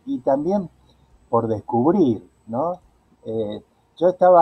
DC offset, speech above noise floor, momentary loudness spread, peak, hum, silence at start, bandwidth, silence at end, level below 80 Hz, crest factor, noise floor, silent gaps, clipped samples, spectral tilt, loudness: under 0.1%; 37 dB; 16 LU; -4 dBFS; none; 0.05 s; 6 kHz; 0 s; -58 dBFS; 18 dB; -55 dBFS; none; under 0.1%; -9.5 dB/octave; -21 LUFS